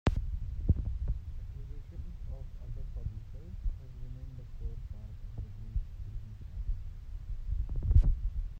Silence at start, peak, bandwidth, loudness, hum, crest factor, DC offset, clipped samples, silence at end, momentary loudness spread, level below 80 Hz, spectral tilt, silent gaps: 0.05 s; -12 dBFS; 5.6 kHz; -39 LUFS; none; 22 dB; under 0.1%; under 0.1%; 0 s; 14 LU; -36 dBFS; -8.5 dB/octave; none